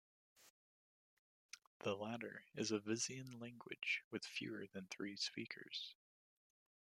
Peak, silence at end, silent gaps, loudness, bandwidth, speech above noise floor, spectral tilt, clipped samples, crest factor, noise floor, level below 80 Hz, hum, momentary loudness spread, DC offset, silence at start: -28 dBFS; 1 s; 0.50-1.49 s, 1.67-1.80 s, 4.04-4.11 s; -46 LUFS; 16 kHz; over 43 dB; -3 dB/octave; under 0.1%; 22 dB; under -90 dBFS; -90 dBFS; none; 12 LU; under 0.1%; 0.4 s